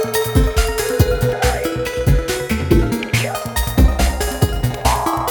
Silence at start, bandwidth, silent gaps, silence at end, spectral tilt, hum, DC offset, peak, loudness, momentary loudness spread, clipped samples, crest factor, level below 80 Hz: 0 s; over 20 kHz; none; 0 s; -5 dB/octave; none; under 0.1%; 0 dBFS; -18 LUFS; 4 LU; under 0.1%; 16 dB; -20 dBFS